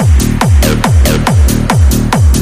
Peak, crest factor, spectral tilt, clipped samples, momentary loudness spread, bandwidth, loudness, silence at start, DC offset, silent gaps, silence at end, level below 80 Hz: 0 dBFS; 8 dB; -5.5 dB/octave; under 0.1%; 1 LU; 16 kHz; -9 LUFS; 0 s; under 0.1%; none; 0 s; -12 dBFS